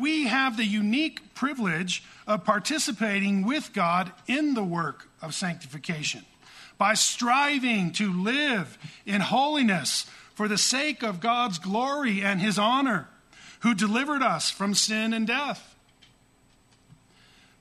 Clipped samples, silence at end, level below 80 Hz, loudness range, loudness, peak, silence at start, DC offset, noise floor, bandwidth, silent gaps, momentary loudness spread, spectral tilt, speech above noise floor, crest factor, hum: under 0.1%; 2 s; -70 dBFS; 3 LU; -25 LUFS; -8 dBFS; 0 s; under 0.1%; -61 dBFS; 13.5 kHz; none; 9 LU; -3.5 dB/octave; 35 dB; 18 dB; none